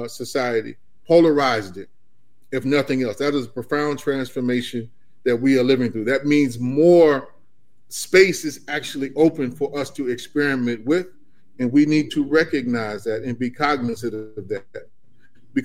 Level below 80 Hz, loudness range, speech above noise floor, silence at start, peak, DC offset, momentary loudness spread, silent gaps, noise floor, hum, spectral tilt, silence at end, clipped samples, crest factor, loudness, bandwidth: -60 dBFS; 5 LU; 48 dB; 0 s; -2 dBFS; 0.9%; 15 LU; none; -68 dBFS; none; -5.5 dB/octave; 0 s; under 0.1%; 20 dB; -20 LUFS; 16 kHz